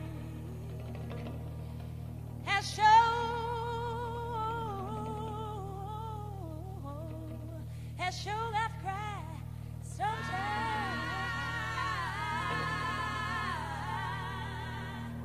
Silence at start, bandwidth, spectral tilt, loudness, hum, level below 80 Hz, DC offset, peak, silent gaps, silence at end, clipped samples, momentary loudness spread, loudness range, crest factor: 0 s; 15 kHz; -5 dB/octave; -35 LUFS; none; -50 dBFS; 0.1%; -14 dBFS; none; 0 s; under 0.1%; 10 LU; 9 LU; 20 dB